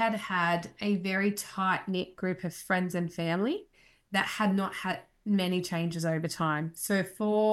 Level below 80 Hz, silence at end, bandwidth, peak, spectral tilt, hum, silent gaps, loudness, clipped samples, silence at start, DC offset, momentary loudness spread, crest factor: -68 dBFS; 0 s; 14.5 kHz; -14 dBFS; -5 dB/octave; none; none; -30 LUFS; under 0.1%; 0 s; under 0.1%; 6 LU; 16 dB